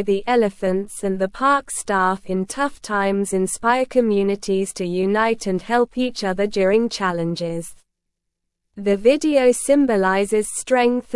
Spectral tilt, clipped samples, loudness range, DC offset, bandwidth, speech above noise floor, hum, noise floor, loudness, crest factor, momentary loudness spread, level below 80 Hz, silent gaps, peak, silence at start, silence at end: -4.5 dB/octave; under 0.1%; 2 LU; under 0.1%; 12 kHz; 59 dB; none; -78 dBFS; -20 LUFS; 16 dB; 7 LU; -50 dBFS; none; -2 dBFS; 0 s; 0 s